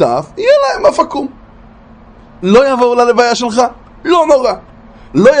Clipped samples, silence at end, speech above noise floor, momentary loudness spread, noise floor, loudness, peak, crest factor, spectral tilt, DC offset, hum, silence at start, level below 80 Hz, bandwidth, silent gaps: 0.2%; 0 s; 28 dB; 11 LU; -38 dBFS; -11 LUFS; 0 dBFS; 12 dB; -5 dB/octave; under 0.1%; none; 0 s; -42 dBFS; 10 kHz; none